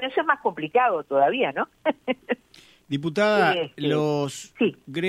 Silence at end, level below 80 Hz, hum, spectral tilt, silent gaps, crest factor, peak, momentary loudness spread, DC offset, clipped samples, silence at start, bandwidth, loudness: 0 s; -68 dBFS; none; -5.5 dB/octave; none; 18 dB; -6 dBFS; 9 LU; under 0.1%; under 0.1%; 0 s; 15 kHz; -24 LUFS